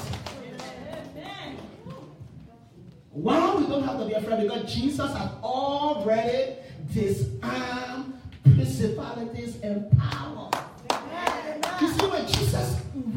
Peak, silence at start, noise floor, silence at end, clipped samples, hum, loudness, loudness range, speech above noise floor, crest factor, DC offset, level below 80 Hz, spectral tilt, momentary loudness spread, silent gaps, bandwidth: -4 dBFS; 0 s; -49 dBFS; 0 s; under 0.1%; none; -26 LUFS; 4 LU; 23 dB; 24 dB; under 0.1%; -46 dBFS; -6 dB/octave; 17 LU; none; 16.5 kHz